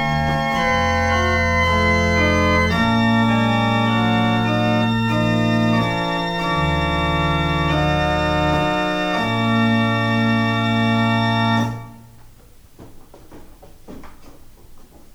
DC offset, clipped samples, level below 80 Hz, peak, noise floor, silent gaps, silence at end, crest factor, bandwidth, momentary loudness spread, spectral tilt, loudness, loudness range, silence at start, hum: under 0.1%; under 0.1%; -34 dBFS; -4 dBFS; -45 dBFS; none; 0.35 s; 14 dB; 16.5 kHz; 3 LU; -6 dB/octave; -18 LUFS; 5 LU; 0 s; none